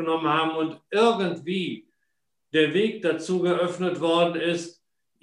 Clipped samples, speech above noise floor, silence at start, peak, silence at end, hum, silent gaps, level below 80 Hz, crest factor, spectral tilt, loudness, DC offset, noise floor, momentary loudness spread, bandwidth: under 0.1%; 56 dB; 0 s; -6 dBFS; 0.55 s; none; none; -74 dBFS; 18 dB; -5.5 dB/octave; -24 LUFS; under 0.1%; -80 dBFS; 8 LU; 11 kHz